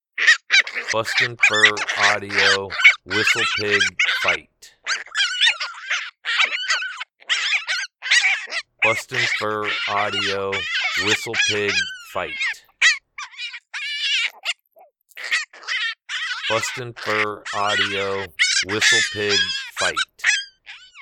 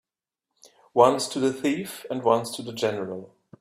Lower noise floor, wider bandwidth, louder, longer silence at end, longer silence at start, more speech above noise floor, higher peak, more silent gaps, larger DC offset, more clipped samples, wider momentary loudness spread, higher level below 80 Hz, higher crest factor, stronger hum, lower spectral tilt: second, -54 dBFS vs -86 dBFS; first, 18.5 kHz vs 15.5 kHz; first, -19 LUFS vs -25 LUFS; second, 0 s vs 0.35 s; second, 0.15 s vs 0.95 s; second, 33 dB vs 62 dB; about the same, -2 dBFS vs -2 dBFS; neither; neither; neither; about the same, 11 LU vs 13 LU; about the same, -64 dBFS vs -68 dBFS; about the same, 20 dB vs 22 dB; neither; second, -1 dB/octave vs -4.5 dB/octave